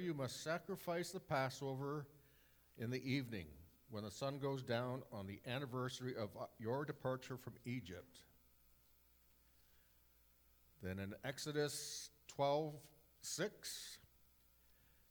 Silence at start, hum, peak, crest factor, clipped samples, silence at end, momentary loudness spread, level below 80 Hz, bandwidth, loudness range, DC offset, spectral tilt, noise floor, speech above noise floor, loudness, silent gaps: 0 s; 60 Hz at -75 dBFS; -26 dBFS; 20 dB; under 0.1%; 1.1 s; 12 LU; -76 dBFS; over 20 kHz; 10 LU; under 0.1%; -4.5 dB/octave; -72 dBFS; 27 dB; -45 LUFS; none